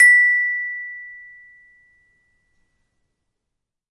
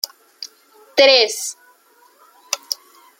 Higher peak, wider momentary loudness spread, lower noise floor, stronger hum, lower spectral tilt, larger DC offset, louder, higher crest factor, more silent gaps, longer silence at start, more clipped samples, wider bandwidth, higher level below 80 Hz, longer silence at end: about the same, -2 dBFS vs 0 dBFS; about the same, 26 LU vs 24 LU; first, -80 dBFS vs -54 dBFS; neither; second, 3.5 dB/octave vs 1 dB/octave; neither; about the same, -16 LUFS vs -17 LUFS; about the same, 18 dB vs 20 dB; neither; second, 0 s vs 0.4 s; neither; second, 11 kHz vs 17 kHz; first, -68 dBFS vs -74 dBFS; first, 2.75 s vs 0.45 s